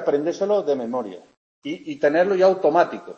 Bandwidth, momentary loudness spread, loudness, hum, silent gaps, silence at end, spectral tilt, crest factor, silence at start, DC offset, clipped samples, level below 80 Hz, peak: 7.2 kHz; 16 LU; -20 LUFS; none; 1.37-1.62 s; 0.05 s; -6 dB/octave; 16 dB; 0 s; under 0.1%; under 0.1%; -72 dBFS; -4 dBFS